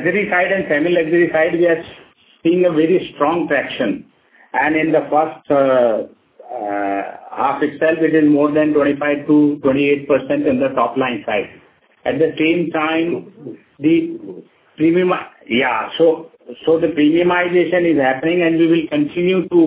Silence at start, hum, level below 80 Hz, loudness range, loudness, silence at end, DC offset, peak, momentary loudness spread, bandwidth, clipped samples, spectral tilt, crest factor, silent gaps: 0 s; none; -56 dBFS; 4 LU; -16 LUFS; 0 s; under 0.1%; 0 dBFS; 10 LU; 4 kHz; under 0.1%; -10 dB/octave; 16 dB; none